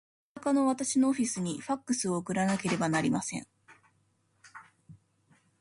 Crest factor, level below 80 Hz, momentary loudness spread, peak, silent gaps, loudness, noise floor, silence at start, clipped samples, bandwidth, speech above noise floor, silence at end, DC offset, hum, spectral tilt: 16 dB; -70 dBFS; 10 LU; -16 dBFS; none; -30 LUFS; -72 dBFS; 0.35 s; under 0.1%; 11.5 kHz; 42 dB; 0.65 s; under 0.1%; none; -4.5 dB/octave